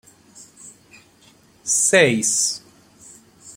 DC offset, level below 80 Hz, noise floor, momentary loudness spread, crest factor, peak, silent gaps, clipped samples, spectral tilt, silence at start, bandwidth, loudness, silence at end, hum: under 0.1%; -64 dBFS; -53 dBFS; 18 LU; 22 dB; -2 dBFS; none; under 0.1%; -2 dB/octave; 0.4 s; 16.5 kHz; -17 LUFS; 0.05 s; none